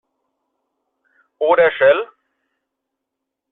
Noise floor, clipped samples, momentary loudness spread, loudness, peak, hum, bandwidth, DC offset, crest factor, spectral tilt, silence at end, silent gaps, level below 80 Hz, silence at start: -80 dBFS; under 0.1%; 11 LU; -15 LUFS; -2 dBFS; none; 4 kHz; under 0.1%; 18 dB; -7 dB/octave; 1.45 s; none; -64 dBFS; 1.4 s